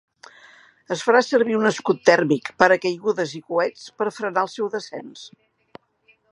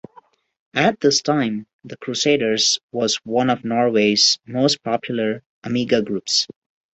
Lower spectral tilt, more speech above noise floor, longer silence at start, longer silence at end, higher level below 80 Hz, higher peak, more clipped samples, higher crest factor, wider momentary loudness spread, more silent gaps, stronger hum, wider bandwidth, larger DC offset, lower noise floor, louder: first, -4.5 dB/octave vs -3 dB/octave; first, 40 dB vs 32 dB; first, 0.9 s vs 0.75 s; first, 1.05 s vs 0.5 s; second, -70 dBFS vs -62 dBFS; about the same, 0 dBFS vs -2 dBFS; neither; about the same, 22 dB vs 18 dB; about the same, 13 LU vs 11 LU; second, none vs 1.73-1.79 s, 2.83-2.89 s, 5.46-5.62 s; neither; first, 11 kHz vs 8.4 kHz; neither; first, -61 dBFS vs -52 dBFS; about the same, -21 LUFS vs -19 LUFS